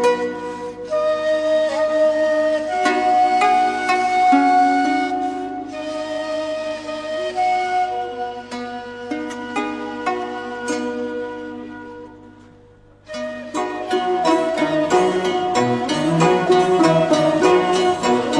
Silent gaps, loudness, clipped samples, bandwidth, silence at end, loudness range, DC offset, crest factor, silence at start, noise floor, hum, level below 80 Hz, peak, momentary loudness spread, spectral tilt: none; -19 LUFS; under 0.1%; 11 kHz; 0 s; 11 LU; under 0.1%; 16 dB; 0 s; -48 dBFS; 50 Hz at -50 dBFS; -56 dBFS; -4 dBFS; 14 LU; -5 dB/octave